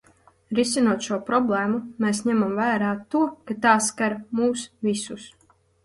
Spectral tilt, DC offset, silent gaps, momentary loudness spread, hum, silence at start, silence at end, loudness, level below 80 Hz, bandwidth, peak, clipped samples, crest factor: -4 dB/octave; under 0.1%; none; 7 LU; none; 0.5 s; 0.55 s; -23 LUFS; -64 dBFS; 11.5 kHz; -4 dBFS; under 0.1%; 20 dB